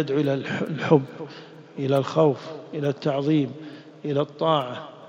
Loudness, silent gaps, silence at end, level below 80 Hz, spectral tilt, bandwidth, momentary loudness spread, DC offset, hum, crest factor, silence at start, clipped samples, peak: -24 LUFS; none; 0 s; -68 dBFS; -7.5 dB/octave; 9.4 kHz; 18 LU; under 0.1%; none; 22 dB; 0 s; under 0.1%; -4 dBFS